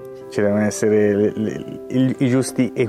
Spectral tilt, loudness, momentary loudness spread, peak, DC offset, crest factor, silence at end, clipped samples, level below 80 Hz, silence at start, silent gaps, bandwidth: -6.5 dB/octave; -19 LUFS; 9 LU; -6 dBFS; under 0.1%; 12 dB; 0 s; under 0.1%; -58 dBFS; 0 s; none; 14.5 kHz